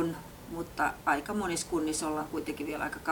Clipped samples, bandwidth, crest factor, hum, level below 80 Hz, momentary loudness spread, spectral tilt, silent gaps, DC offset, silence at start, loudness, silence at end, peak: under 0.1%; over 20 kHz; 18 dB; none; -56 dBFS; 9 LU; -4 dB/octave; none; under 0.1%; 0 s; -33 LUFS; 0 s; -14 dBFS